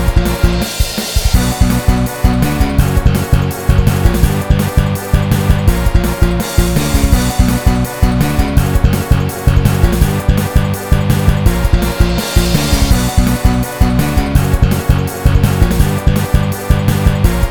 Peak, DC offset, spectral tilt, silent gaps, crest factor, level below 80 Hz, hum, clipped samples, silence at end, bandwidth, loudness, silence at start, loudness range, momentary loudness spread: 0 dBFS; 2%; -6 dB/octave; none; 12 dB; -16 dBFS; none; 1%; 0 s; 18 kHz; -13 LUFS; 0 s; 0 LU; 3 LU